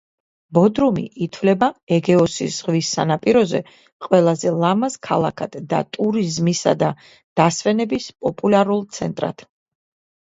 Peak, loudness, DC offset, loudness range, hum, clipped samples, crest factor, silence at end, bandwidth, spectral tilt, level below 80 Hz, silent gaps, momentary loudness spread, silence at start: 0 dBFS; -19 LUFS; under 0.1%; 2 LU; none; under 0.1%; 18 dB; 0.85 s; 8 kHz; -5.5 dB/octave; -56 dBFS; 1.83-1.87 s, 3.92-4.00 s, 7.24-7.36 s; 9 LU; 0.5 s